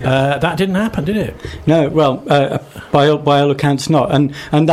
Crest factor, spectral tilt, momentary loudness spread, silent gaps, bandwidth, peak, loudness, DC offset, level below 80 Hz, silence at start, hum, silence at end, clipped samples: 12 dB; -6.5 dB/octave; 7 LU; none; 14.5 kHz; -2 dBFS; -15 LUFS; under 0.1%; -40 dBFS; 0 s; none; 0 s; under 0.1%